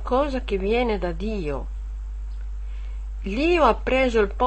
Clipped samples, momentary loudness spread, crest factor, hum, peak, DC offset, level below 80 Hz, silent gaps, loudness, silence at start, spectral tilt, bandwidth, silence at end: under 0.1%; 16 LU; 18 dB; none; -6 dBFS; 0.4%; -30 dBFS; none; -23 LUFS; 0 s; -6.5 dB/octave; 8.6 kHz; 0 s